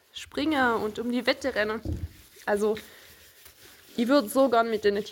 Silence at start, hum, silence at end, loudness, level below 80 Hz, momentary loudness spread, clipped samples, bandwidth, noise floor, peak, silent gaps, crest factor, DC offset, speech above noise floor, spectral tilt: 0.15 s; none; 0 s; -26 LUFS; -50 dBFS; 13 LU; under 0.1%; 17 kHz; -53 dBFS; -10 dBFS; none; 18 dB; under 0.1%; 27 dB; -5 dB/octave